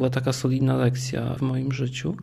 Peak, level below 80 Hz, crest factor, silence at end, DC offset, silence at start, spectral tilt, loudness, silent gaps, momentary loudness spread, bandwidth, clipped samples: -10 dBFS; -52 dBFS; 14 dB; 0 s; under 0.1%; 0 s; -6.5 dB/octave; -25 LUFS; none; 6 LU; 13 kHz; under 0.1%